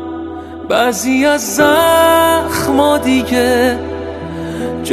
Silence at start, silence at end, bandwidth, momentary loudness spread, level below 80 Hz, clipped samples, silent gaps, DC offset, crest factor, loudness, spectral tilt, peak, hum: 0 s; 0 s; 13.5 kHz; 15 LU; -38 dBFS; under 0.1%; none; under 0.1%; 14 dB; -13 LUFS; -3.5 dB/octave; 0 dBFS; none